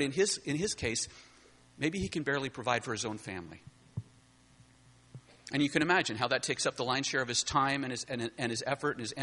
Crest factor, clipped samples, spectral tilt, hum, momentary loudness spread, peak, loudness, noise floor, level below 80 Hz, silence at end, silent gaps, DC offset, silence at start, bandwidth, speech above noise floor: 22 dB; under 0.1%; -3.5 dB/octave; none; 14 LU; -12 dBFS; -32 LUFS; -62 dBFS; -60 dBFS; 0 s; none; under 0.1%; 0 s; 11.5 kHz; 29 dB